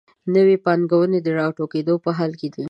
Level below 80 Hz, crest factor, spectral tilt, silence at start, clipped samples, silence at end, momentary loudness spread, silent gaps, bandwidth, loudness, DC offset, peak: -70 dBFS; 16 dB; -9 dB/octave; 0.25 s; under 0.1%; 0 s; 8 LU; none; 6 kHz; -19 LUFS; under 0.1%; -4 dBFS